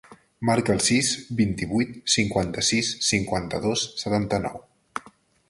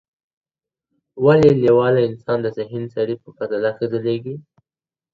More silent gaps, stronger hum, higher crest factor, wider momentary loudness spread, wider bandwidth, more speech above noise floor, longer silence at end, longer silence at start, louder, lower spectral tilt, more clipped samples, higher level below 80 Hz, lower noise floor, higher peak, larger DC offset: neither; neither; about the same, 18 dB vs 18 dB; about the same, 14 LU vs 14 LU; first, 11.5 kHz vs 7.4 kHz; second, 30 dB vs over 72 dB; second, 0.4 s vs 0.75 s; second, 0.1 s vs 1.15 s; second, -24 LUFS vs -18 LUFS; second, -3.5 dB/octave vs -8.5 dB/octave; neither; first, -48 dBFS vs -54 dBFS; second, -54 dBFS vs under -90 dBFS; second, -6 dBFS vs 0 dBFS; neither